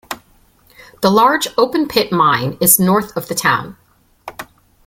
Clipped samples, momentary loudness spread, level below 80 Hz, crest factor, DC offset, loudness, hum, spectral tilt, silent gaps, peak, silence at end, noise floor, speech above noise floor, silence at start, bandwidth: under 0.1%; 21 LU; -50 dBFS; 16 dB; under 0.1%; -14 LUFS; none; -3.5 dB/octave; none; 0 dBFS; 0.45 s; -52 dBFS; 38 dB; 0.1 s; 17 kHz